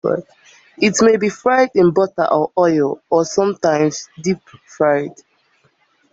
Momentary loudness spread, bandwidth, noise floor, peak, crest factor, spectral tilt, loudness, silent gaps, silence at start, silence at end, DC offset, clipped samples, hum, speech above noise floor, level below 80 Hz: 9 LU; 8 kHz; -59 dBFS; -2 dBFS; 14 dB; -5 dB/octave; -16 LUFS; none; 0.05 s; 1 s; under 0.1%; under 0.1%; none; 43 dB; -58 dBFS